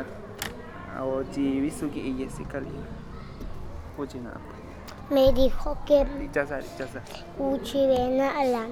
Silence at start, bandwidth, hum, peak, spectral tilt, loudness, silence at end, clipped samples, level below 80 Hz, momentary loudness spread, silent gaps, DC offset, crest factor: 0 s; 17.5 kHz; none; -8 dBFS; -6 dB/octave; -27 LUFS; 0 s; under 0.1%; -38 dBFS; 18 LU; none; under 0.1%; 18 dB